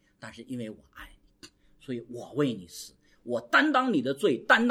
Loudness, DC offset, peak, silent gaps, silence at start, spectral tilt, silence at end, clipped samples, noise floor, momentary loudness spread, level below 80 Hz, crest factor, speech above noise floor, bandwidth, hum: -27 LUFS; under 0.1%; -6 dBFS; none; 0.25 s; -4.5 dB/octave; 0 s; under 0.1%; -55 dBFS; 24 LU; -64 dBFS; 22 dB; 28 dB; 16 kHz; none